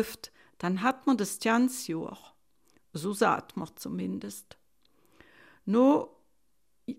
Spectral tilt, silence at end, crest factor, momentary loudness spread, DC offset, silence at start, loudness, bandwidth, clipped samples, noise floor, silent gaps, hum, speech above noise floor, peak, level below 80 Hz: -5 dB/octave; 0.05 s; 18 dB; 20 LU; under 0.1%; 0 s; -29 LUFS; 16 kHz; under 0.1%; -78 dBFS; none; none; 49 dB; -12 dBFS; -70 dBFS